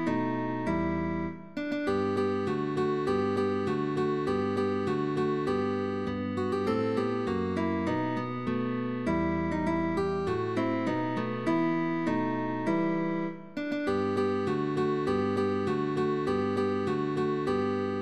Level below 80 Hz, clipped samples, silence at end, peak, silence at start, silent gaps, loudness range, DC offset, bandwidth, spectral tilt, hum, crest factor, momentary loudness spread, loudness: -56 dBFS; under 0.1%; 0 s; -16 dBFS; 0 s; none; 1 LU; under 0.1%; 11 kHz; -7.5 dB/octave; none; 12 dB; 4 LU; -30 LUFS